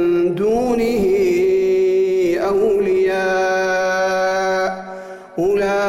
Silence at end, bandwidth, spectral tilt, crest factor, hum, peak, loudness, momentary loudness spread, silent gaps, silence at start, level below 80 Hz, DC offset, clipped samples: 0 s; 15 kHz; -5.5 dB/octave; 8 dB; none; -8 dBFS; -17 LUFS; 6 LU; none; 0 s; -46 dBFS; under 0.1%; under 0.1%